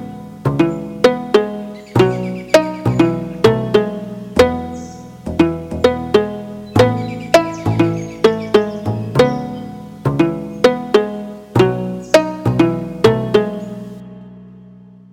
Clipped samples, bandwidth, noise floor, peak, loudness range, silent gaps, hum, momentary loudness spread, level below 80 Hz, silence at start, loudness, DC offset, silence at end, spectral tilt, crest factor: under 0.1%; 17 kHz; -41 dBFS; -2 dBFS; 2 LU; none; none; 14 LU; -44 dBFS; 0 s; -16 LUFS; under 0.1%; 0.45 s; -6.5 dB/octave; 16 dB